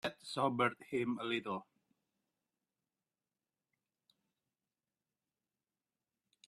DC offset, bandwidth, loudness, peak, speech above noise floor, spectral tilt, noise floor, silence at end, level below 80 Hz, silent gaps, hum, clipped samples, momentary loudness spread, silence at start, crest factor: under 0.1%; 13 kHz; -38 LUFS; -18 dBFS; over 53 dB; -5.5 dB/octave; under -90 dBFS; 4.85 s; -82 dBFS; none; none; under 0.1%; 9 LU; 0.05 s; 26 dB